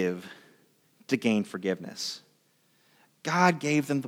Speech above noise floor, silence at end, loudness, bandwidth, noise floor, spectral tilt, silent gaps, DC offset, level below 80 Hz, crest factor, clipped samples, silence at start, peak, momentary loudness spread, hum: 40 dB; 0 s; -28 LUFS; 16.5 kHz; -67 dBFS; -5 dB/octave; none; under 0.1%; -80 dBFS; 24 dB; under 0.1%; 0 s; -6 dBFS; 16 LU; none